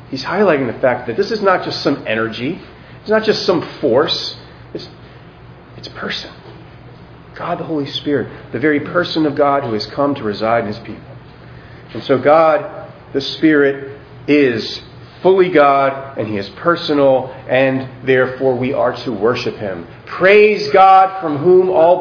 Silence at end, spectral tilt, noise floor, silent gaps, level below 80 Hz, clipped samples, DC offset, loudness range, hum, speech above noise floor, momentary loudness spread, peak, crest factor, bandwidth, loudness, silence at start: 0 s; -6.5 dB/octave; -38 dBFS; none; -50 dBFS; under 0.1%; under 0.1%; 9 LU; none; 24 dB; 19 LU; 0 dBFS; 16 dB; 5.4 kHz; -15 LUFS; 0.1 s